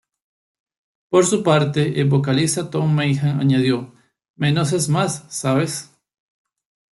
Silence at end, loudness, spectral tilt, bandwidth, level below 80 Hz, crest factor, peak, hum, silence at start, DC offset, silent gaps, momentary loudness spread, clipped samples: 1.15 s; -19 LUFS; -5.5 dB/octave; 12 kHz; -58 dBFS; 18 dB; -2 dBFS; none; 1.1 s; under 0.1%; 4.30-4.34 s; 7 LU; under 0.1%